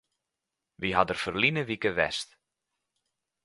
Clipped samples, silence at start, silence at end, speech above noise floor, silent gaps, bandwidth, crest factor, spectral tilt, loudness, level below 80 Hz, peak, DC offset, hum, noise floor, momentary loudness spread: under 0.1%; 0.8 s; 1.2 s; 59 dB; none; 11.5 kHz; 24 dB; -4.5 dB/octave; -28 LUFS; -58 dBFS; -6 dBFS; under 0.1%; none; -87 dBFS; 9 LU